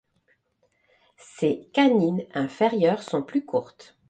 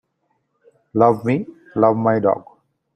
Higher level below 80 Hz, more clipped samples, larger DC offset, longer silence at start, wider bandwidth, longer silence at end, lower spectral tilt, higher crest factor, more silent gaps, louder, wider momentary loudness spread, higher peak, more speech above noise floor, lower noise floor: second, -70 dBFS vs -60 dBFS; neither; neither; first, 1.4 s vs 0.95 s; about the same, 9 kHz vs 9.2 kHz; about the same, 0.45 s vs 0.55 s; second, -6.5 dB/octave vs -10 dB/octave; about the same, 18 dB vs 20 dB; neither; second, -24 LUFS vs -19 LUFS; about the same, 9 LU vs 10 LU; second, -8 dBFS vs 0 dBFS; second, 46 dB vs 53 dB; about the same, -70 dBFS vs -69 dBFS